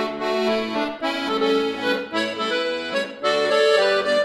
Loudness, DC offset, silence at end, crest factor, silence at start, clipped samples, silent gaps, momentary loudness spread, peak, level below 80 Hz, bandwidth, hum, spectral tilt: -21 LUFS; under 0.1%; 0 s; 16 dB; 0 s; under 0.1%; none; 7 LU; -6 dBFS; -62 dBFS; 14.5 kHz; none; -3.5 dB/octave